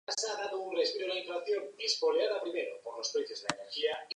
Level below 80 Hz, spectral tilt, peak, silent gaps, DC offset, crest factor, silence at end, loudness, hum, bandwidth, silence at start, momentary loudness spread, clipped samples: -84 dBFS; -1 dB/octave; -12 dBFS; none; under 0.1%; 22 dB; 0.05 s; -34 LUFS; none; 11 kHz; 0.1 s; 7 LU; under 0.1%